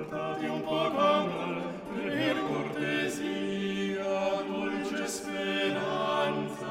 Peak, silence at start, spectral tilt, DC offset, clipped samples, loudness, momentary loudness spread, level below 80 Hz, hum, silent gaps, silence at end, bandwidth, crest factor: -14 dBFS; 0 s; -4.5 dB/octave; under 0.1%; under 0.1%; -31 LUFS; 7 LU; -66 dBFS; none; none; 0 s; 16 kHz; 16 dB